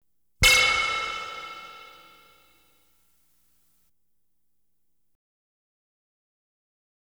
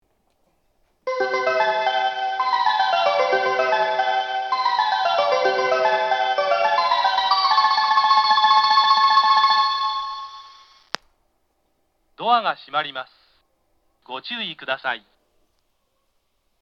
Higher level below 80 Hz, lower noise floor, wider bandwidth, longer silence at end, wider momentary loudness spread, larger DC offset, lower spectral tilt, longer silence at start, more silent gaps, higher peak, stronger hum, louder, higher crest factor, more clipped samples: first, -46 dBFS vs -70 dBFS; first, -79 dBFS vs -70 dBFS; first, over 20 kHz vs 7.2 kHz; first, 5.3 s vs 1.65 s; first, 24 LU vs 15 LU; neither; about the same, -0.5 dB/octave vs -1.5 dB/octave; second, 0.4 s vs 1.05 s; neither; second, -6 dBFS vs 0 dBFS; first, 60 Hz at -85 dBFS vs none; about the same, -20 LUFS vs -19 LUFS; about the same, 24 dB vs 20 dB; neither